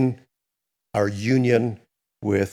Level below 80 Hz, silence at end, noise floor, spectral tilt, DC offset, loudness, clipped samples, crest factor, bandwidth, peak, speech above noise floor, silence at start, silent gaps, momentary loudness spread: -64 dBFS; 0 s; -83 dBFS; -7 dB/octave; under 0.1%; -23 LUFS; under 0.1%; 18 dB; 13.5 kHz; -6 dBFS; 62 dB; 0 s; none; 16 LU